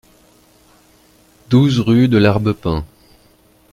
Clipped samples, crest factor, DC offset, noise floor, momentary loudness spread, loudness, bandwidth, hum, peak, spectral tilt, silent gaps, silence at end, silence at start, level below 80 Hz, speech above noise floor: under 0.1%; 18 dB; under 0.1%; -52 dBFS; 11 LU; -15 LUFS; 14.5 kHz; 60 Hz at -35 dBFS; 0 dBFS; -7.5 dB/octave; none; 0.85 s; 1.5 s; -40 dBFS; 39 dB